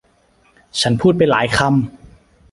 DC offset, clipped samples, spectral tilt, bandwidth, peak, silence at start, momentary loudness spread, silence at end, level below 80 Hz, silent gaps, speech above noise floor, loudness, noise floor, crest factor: under 0.1%; under 0.1%; -5 dB/octave; 11.5 kHz; 0 dBFS; 0.75 s; 9 LU; 0.55 s; -44 dBFS; none; 41 dB; -16 LUFS; -56 dBFS; 18 dB